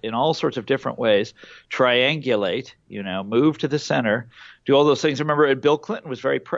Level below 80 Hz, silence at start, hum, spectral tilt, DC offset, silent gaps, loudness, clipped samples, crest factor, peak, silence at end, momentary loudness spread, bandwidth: -66 dBFS; 0 s; none; -5.5 dB/octave; under 0.1%; none; -21 LUFS; under 0.1%; 16 dB; -6 dBFS; 0 s; 12 LU; 7.8 kHz